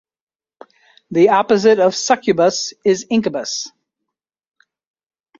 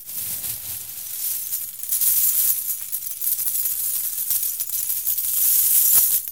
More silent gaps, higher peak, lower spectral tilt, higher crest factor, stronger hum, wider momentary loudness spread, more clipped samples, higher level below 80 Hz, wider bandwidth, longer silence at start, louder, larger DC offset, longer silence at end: neither; about the same, -2 dBFS vs -2 dBFS; first, -4 dB/octave vs 2 dB/octave; about the same, 16 dB vs 20 dB; neither; about the same, 10 LU vs 12 LU; neither; about the same, -62 dBFS vs -64 dBFS; second, 7.8 kHz vs 19 kHz; first, 1.1 s vs 0 s; first, -16 LUFS vs -19 LUFS; second, under 0.1% vs 0.2%; first, 1.7 s vs 0 s